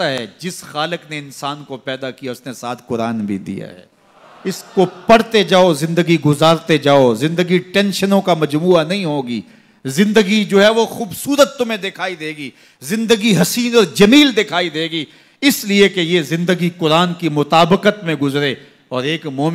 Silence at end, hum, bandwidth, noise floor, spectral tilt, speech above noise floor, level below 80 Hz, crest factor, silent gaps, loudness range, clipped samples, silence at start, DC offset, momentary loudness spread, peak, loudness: 0 s; none; 16 kHz; -45 dBFS; -5 dB/octave; 30 dB; -54 dBFS; 14 dB; none; 10 LU; under 0.1%; 0 s; under 0.1%; 15 LU; -2 dBFS; -15 LUFS